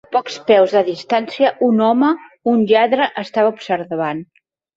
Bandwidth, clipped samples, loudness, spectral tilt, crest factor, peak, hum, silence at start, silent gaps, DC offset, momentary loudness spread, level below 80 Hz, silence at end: 7.6 kHz; under 0.1%; -16 LUFS; -6 dB/octave; 16 dB; -2 dBFS; none; 0.1 s; none; under 0.1%; 8 LU; -64 dBFS; 0.55 s